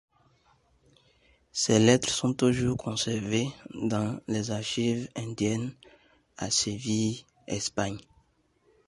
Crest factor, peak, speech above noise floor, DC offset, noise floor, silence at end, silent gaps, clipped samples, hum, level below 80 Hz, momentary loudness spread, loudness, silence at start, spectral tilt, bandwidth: 24 dB; -6 dBFS; 40 dB; under 0.1%; -68 dBFS; 0.85 s; none; under 0.1%; none; -58 dBFS; 13 LU; -28 LUFS; 1.55 s; -4.5 dB/octave; 11.5 kHz